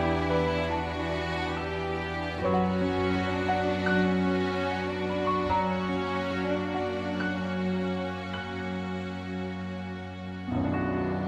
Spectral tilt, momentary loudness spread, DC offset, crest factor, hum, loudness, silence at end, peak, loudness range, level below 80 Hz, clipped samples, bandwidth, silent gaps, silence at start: -7 dB/octave; 8 LU; under 0.1%; 16 dB; none; -29 LUFS; 0 s; -14 dBFS; 5 LU; -48 dBFS; under 0.1%; 9.4 kHz; none; 0 s